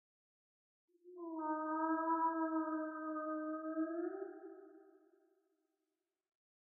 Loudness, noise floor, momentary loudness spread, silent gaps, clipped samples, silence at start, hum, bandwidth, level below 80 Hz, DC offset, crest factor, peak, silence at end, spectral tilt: -40 LUFS; under -90 dBFS; 17 LU; none; under 0.1%; 1.05 s; none; 1.9 kHz; under -90 dBFS; under 0.1%; 18 dB; -26 dBFS; 1.7 s; 11 dB/octave